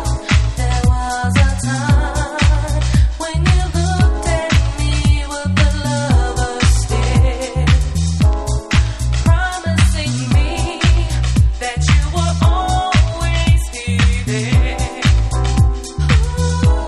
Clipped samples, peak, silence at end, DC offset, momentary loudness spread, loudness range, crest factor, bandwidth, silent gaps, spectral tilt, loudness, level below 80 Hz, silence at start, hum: under 0.1%; 0 dBFS; 0 s; under 0.1%; 3 LU; 1 LU; 14 dB; 12 kHz; none; -5 dB/octave; -16 LUFS; -18 dBFS; 0 s; none